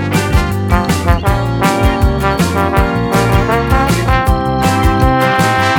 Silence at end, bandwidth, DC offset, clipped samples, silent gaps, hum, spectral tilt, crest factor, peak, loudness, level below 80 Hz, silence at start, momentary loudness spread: 0 s; 19 kHz; under 0.1%; under 0.1%; none; none; -6 dB/octave; 12 dB; 0 dBFS; -13 LUFS; -18 dBFS; 0 s; 3 LU